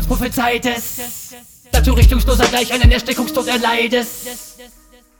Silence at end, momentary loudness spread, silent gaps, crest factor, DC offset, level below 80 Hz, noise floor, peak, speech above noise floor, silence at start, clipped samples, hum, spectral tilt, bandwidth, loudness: 0.55 s; 15 LU; none; 14 dB; under 0.1%; -18 dBFS; -47 dBFS; -2 dBFS; 32 dB; 0 s; under 0.1%; none; -4.5 dB/octave; over 20 kHz; -16 LUFS